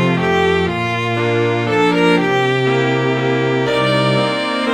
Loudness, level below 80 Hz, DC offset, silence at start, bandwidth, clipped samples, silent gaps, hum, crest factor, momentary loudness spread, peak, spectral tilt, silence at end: -15 LUFS; -48 dBFS; under 0.1%; 0 s; 11.5 kHz; under 0.1%; none; none; 14 dB; 4 LU; -2 dBFS; -6 dB/octave; 0 s